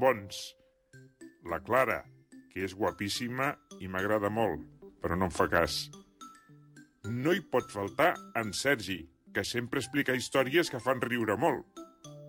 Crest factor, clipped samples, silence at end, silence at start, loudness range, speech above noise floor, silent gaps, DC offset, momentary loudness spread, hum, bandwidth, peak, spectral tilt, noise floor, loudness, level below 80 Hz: 20 dB; under 0.1%; 0 s; 0 s; 3 LU; 27 dB; none; under 0.1%; 17 LU; none; 17 kHz; -12 dBFS; -4.5 dB/octave; -58 dBFS; -31 LUFS; -58 dBFS